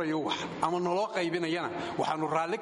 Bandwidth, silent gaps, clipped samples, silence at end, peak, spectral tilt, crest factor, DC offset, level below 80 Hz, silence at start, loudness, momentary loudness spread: 11.5 kHz; none; under 0.1%; 0 s; -12 dBFS; -5 dB/octave; 18 dB; under 0.1%; -68 dBFS; 0 s; -31 LUFS; 3 LU